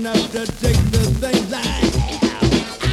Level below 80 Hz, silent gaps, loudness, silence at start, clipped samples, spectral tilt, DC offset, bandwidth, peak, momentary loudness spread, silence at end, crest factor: -26 dBFS; none; -19 LUFS; 0 s; under 0.1%; -5 dB/octave; under 0.1%; 16 kHz; -2 dBFS; 4 LU; 0 s; 14 dB